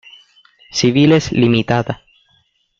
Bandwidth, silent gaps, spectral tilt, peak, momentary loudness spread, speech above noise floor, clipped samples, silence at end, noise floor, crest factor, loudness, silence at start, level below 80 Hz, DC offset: 7.8 kHz; none; -5.5 dB/octave; -2 dBFS; 13 LU; 46 dB; under 0.1%; 0.85 s; -59 dBFS; 16 dB; -15 LUFS; 0.75 s; -48 dBFS; under 0.1%